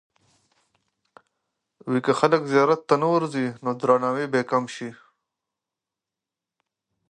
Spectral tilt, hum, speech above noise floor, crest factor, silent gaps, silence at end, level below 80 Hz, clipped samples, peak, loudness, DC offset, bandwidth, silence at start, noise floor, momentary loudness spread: -6 dB/octave; none; 66 dB; 22 dB; none; 2.2 s; -76 dBFS; under 0.1%; -2 dBFS; -22 LUFS; under 0.1%; 10 kHz; 1.85 s; -88 dBFS; 12 LU